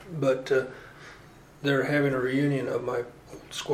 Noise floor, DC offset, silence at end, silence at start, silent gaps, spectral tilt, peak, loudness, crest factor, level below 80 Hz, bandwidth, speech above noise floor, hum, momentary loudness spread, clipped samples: -51 dBFS; under 0.1%; 0 s; 0 s; none; -6 dB/octave; -14 dBFS; -27 LUFS; 14 dB; -60 dBFS; 15 kHz; 24 dB; none; 21 LU; under 0.1%